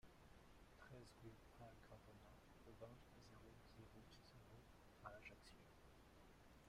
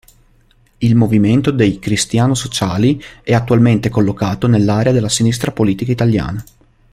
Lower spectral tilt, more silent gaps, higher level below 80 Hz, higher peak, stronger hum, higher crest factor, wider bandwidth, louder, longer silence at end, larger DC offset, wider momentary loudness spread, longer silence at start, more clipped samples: about the same, -5 dB/octave vs -6 dB/octave; neither; second, -72 dBFS vs -40 dBFS; second, -42 dBFS vs -2 dBFS; neither; first, 24 dB vs 12 dB; about the same, 15.5 kHz vs 15 kHz; second, -66 LUFS vs -14 LUFS; second, 0 s vs 0.5 s; neither; about the same, 7 LU vs 5 LU; second, 0 s vs 0.8 s; neither